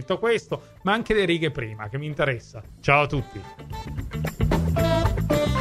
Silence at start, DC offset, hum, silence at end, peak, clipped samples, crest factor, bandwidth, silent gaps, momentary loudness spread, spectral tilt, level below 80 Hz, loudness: 0 s; under 0.1%; none; 0 s; -4 dBFS; under 0.1%; 20 dB; 15 kHz; none; 14 LU; -6 dB/octave; -36 dBFS; -24 LUFS